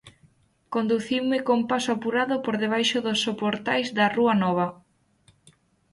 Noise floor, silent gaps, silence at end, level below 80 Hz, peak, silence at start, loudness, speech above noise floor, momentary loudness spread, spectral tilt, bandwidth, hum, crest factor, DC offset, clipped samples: -62 dBFS; none; 1.2 s; -66 dBFS; -8 dBFS; 0.05 s; -24 LUFS; 38 dB; 5 LU; -4.5 dB/octave; 11.5 kHz; none; 16 dB; under 0.1%; under 0.1%